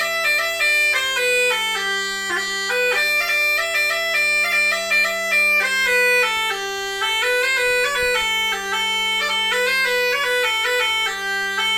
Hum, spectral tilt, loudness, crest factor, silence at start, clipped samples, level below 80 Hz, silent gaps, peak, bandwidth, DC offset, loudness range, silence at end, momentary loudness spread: none; 0.5 dB/octave; -17 LUFS; 12 dB; 0 s; under 0.1%; -54 dBFS; none; -8 dBFS; 17 kHz; under 0.1%; 2 LU; 0 s; 5 LU